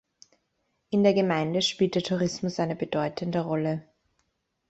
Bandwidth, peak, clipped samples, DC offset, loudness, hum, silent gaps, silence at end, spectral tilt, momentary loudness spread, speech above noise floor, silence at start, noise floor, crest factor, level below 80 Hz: 8.2 kHz; -8 dBFS; under 0.1%; under 0.1%; -27 LUFS; none; none; 0.9 s; -5.5 dB/octave; 7 LU; 50 dB; 0.9 s; -76 dBFS; 20 dB; -64 dBFS